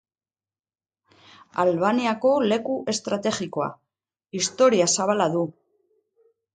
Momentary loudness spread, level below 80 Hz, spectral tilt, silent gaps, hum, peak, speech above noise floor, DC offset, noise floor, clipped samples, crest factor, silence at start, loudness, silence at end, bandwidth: 11 LU; -70 dBFS; -4 dB/octave; none; none; -6 dBFS; over 68 dB; under 0.1%; under -90 dBFS; under 0.1%; 18 dB; 1.55 s; -23 LUFS; 1.05 s; 9.6 kHz